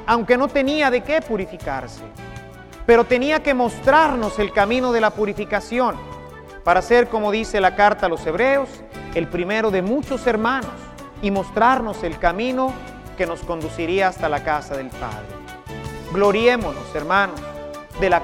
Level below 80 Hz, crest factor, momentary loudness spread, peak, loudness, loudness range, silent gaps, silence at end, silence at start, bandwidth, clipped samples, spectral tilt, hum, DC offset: -40 dBFS; 18 dB; 18 LU; -2 dBFS; -19 LUFS; 5 LU; none; 0 s; 0 s; 15.5 kHz; under 0.1%; -5.5 dB/octave; none; under 0.1%